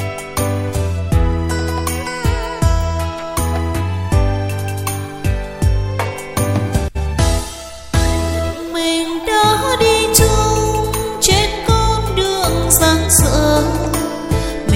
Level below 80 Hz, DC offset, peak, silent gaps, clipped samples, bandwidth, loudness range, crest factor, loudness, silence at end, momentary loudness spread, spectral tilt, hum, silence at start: -22 dBFS; under 0.1%; 0 dBFS; none; under 0.1%; 16.5 kHz; 6 LU; 16 dB; -16 LUFS; 0 s; 10 LU; -4 dB/octave; none; 0 s